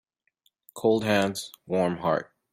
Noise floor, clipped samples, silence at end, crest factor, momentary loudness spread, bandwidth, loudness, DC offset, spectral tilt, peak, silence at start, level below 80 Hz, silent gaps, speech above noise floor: -71 dBFS; under 0.1%; 0.3 s; 18 dB; 9 LU; 16 kHz; -26 LUFS; under 0.1%; -5.5 dB/octave; -10 dBFS; 0.75 s; -66 dBFS; none; 46 dB